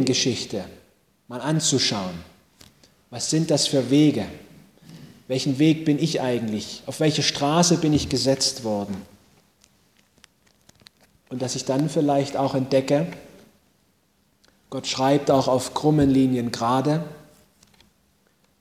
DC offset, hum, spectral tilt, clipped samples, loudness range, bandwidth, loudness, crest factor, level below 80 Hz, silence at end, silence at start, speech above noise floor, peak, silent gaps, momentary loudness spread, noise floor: under 0.1%; none; -4.5 dB/octave; under 0.1%; 5 LU; 15.5 kHz; -22 LUFS; 20 dB; -52 dBFS; 1.4 s; 0 s; 43 dB; -4 dBFS; none; 15 LU; -65 dBFS